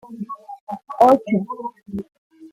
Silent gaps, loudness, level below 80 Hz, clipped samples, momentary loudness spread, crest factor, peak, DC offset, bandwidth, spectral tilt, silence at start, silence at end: 0.61-0.67 s, 2.18-2.30 s; -18 LUFS; -60 dBFS; under 0.1%; 19 LU; 20 dB; -2 dBFS; under 0.1%; 16 kHz; -8 dB/octave; 0.05 s; 0.05 s